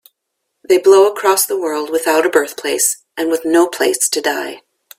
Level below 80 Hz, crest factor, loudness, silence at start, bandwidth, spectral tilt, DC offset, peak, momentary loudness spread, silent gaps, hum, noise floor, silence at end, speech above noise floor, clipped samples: -64 dBFS; 16 dB; -14 LUFS; 0.7 s; 16.5 kHz; -1 dB/octave; under 0.1%; 0 dBFS; 9 LU; none; none; -74 dBFS; 0.4 s; 60 dB; under 0.1%